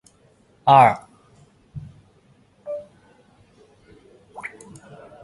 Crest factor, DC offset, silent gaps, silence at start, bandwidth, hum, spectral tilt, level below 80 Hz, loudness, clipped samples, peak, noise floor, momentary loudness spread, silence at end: 24 dB; under 0.1%; none; 0.65 s; 11.5 kHz; none; -6 dB/octave; -60 dBFS; -18 LUFS; under 0.1%; -2 dBFS; -57 dBFS; 30 LU; 0.75 s